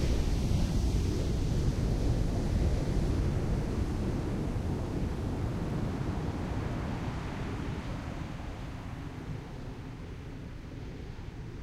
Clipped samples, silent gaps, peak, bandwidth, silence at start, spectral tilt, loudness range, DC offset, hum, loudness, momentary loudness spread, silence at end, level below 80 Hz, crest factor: under 0.1%; none; -16 dBFS; 14.5 kHz; 0 s; -7 dB/octave; 10 LU; under 0.1%; none; -34 LUFS; 12 LU; 0 s; -36 dBFS; 16 dB